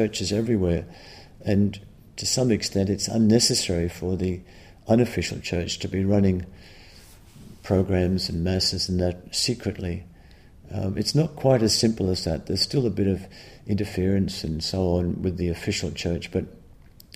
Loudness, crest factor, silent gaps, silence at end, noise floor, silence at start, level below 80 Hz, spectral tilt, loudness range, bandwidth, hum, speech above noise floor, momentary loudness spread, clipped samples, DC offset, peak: -24 LUFS; 18 dB; none; 0.6 s; -49 dBFS; 0 s; -44 dBFS; -5 dB/octave; 3 LU; 15.5 kHz; none; 25 dB; 11 LU; under 0.1%; under 0.1%; -6 dBFS